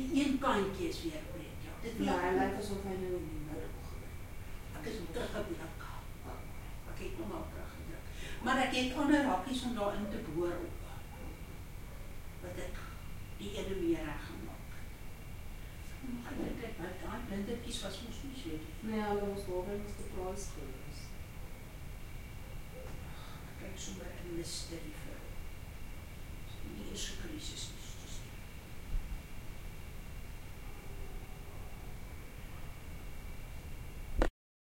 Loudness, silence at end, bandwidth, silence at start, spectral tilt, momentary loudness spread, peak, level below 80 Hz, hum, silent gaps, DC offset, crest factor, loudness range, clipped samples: -41 LUFS; 0.5 s; 16.5 kHz; 0 s; -5 dB/octave; 16 LU; -16 dBFS; -46 dBFS; none; none; under 0.1%; 24 dB; 13 LU; under 0.1%